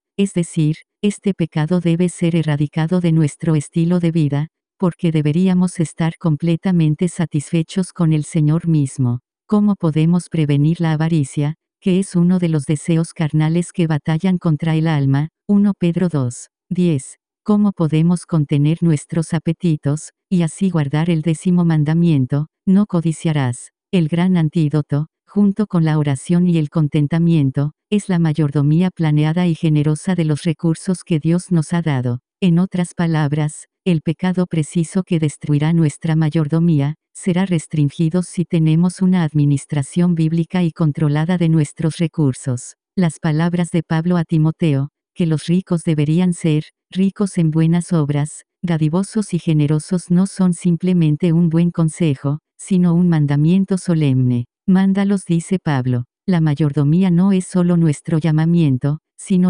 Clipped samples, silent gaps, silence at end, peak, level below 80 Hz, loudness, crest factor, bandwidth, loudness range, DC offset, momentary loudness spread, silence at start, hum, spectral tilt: under 0.1%; none; 0 s; -4 dBFS; -50 dBFS; -17 LUFS; 12 dB; 10.5 kHz; 2 LU; under 0.1%; 6 LU; 0.2 s; none; -7.5 dB/octave